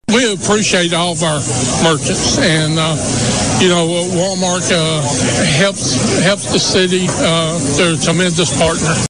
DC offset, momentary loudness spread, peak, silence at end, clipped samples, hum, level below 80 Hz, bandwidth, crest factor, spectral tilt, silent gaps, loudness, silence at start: 0.7%; 3 LU; -4 dBFS; 0 s; under 0.1%; none; -36 dBFS; 11 kHz; 10 dB; -3.5 dB/octave; none; -13 LUFS; 0.1 s